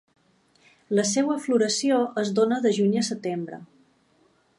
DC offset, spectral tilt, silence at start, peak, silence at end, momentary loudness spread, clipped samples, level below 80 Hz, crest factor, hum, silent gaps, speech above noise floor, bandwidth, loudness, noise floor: under 0.1%; -4.5 dB/octave; 0.9 s; -8 dBFS; 0.95 s; 9 LU; under 0.1%; -76 dBFS; 16 dB; none; none; 40 dB; 11.5 kHz; -24 LUFS; -63 dBFS